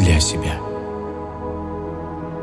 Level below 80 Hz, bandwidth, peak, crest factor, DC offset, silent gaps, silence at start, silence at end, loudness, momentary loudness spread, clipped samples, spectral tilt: -32 dBFS; 12 kHz; -4 dBFS; 18 dB; under 0.1%; none; 0 s; 0 s; -24 LUFS; 12 LU; under 0.1%; -4.5 dB/octave